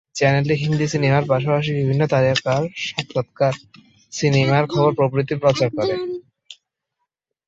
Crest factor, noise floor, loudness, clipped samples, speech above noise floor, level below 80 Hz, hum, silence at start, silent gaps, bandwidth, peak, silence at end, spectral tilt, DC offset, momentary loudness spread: 18 dB; -78 dBFS; -19 LUFS; under 0.1%; 59 dB; -54 dBFS; none; 0.15 s; none; 7.8 kHz; -2 dBFS; 0.95 s; -6 dB/octave; under 0.1%; 8 LU